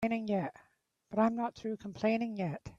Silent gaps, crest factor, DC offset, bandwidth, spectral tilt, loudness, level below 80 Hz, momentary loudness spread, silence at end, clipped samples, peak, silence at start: none; 18 dB; under 0.1%; 7.4 kHz; -7.5 dB/octave; -34 LUFS; -68 dBFS; 9 LU; 0.05 s; under 0.1%; -16 dBFS; 0 s